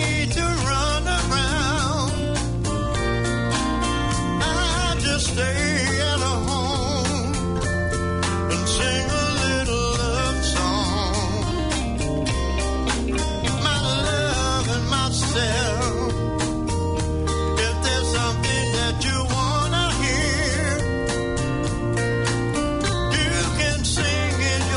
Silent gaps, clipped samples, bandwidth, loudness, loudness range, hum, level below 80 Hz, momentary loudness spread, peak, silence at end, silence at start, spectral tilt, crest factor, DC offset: none; under 0.1%; 11 kHz; -22 LUFS; 1 LU; none; -30 dBFS; 3 LU; -10 dBFS; 0 s; 0 s; -4 dB/octave; 12 dB; under 0.1%